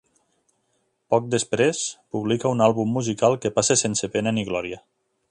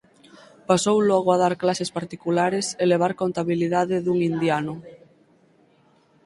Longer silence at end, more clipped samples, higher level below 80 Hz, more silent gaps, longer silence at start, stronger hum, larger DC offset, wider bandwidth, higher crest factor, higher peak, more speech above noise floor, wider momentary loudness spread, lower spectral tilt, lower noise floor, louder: second, 0.5 s vs 1.3 s; neither; about the same, -60 dBFS vs -64 dBFS; neither; first, 1.1 s vs 0.7 s; neither; neither; about the same, 11.5 kHz vs 11.5 kHz; about the same, 20 dB vs 20 dB; about the same, -2 dBFS vs -4 dBFS; first, 49 dB vs 38 dB; about the same, 9 LU vs 9 LU; second, -4 dB/octave vs -5.5 dB/octave; first, -71 dBFS vs -59 dBFS; about the same, -22 LUFS vs -22 LUFS